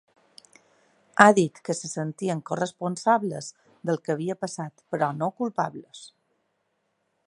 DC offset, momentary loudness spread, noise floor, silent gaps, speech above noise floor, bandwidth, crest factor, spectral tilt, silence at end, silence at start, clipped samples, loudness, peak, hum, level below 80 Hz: under 0.1%; 19 LU; -74 dBFS; none; 49 dB; 11.5 kHz; 26 dB; -5 dB/octave; 1.2 s; 1.15 s; under 0.1%; -25 LUFS; 0 dBFS; none; -72 dBFS